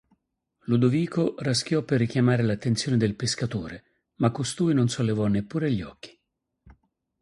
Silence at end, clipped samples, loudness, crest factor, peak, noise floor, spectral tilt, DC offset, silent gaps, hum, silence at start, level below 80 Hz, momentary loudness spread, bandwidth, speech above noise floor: 1.15 s; under 0.1%; -25 LUFS; 18 dB; -8 dBFS; -79 dBFS; -6 dB/octave; under 0.1%; none; none; 0.7 s; -54 dBFS; 10 LU; 11.5 kHz; 55 dB